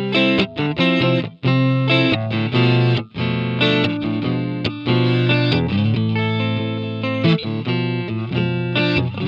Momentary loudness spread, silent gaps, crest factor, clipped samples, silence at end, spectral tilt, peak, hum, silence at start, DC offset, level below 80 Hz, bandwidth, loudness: 7 LU; none; 14 dB; under 0.1%; 0 s; -8 dB/octave; -4 dBFS; none; 0 s; under 0.1%; -48 dBFS; 6.8 kHz; -18 LUFS